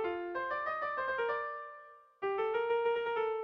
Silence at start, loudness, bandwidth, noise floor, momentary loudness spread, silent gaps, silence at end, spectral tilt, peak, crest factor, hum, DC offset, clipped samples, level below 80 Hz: 0 s; -35 LUFS; 5.6 kHz; -55 dBFS; 10 LU; none; 0 s; -5.5 dB/octave; -22 dBFS; 12 dB; none; under 0.1%; under 0.1%; -72 dBFS